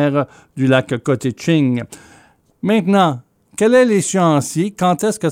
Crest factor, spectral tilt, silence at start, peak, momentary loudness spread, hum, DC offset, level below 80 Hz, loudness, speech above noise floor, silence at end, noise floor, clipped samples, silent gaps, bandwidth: 14 dB; -5.5 dB/octave; 0 s; -2 dBFS; 12 LU; none; under 0.1%; -58 dBFS; -16 LUFS; 35 dB; 0 s; -50 dBFS; under 0.1%; none; 16 kHz